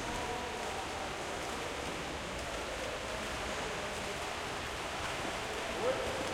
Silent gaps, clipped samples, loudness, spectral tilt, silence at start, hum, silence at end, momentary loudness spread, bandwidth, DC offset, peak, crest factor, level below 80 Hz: none; under 0.1%; -38 LUFS; -3 dB/octave; 0 s; none; 0 s; 3 LU; 16.5 kHz; under 0.1%; -20 dBFS; 18 dB; -52 dBFS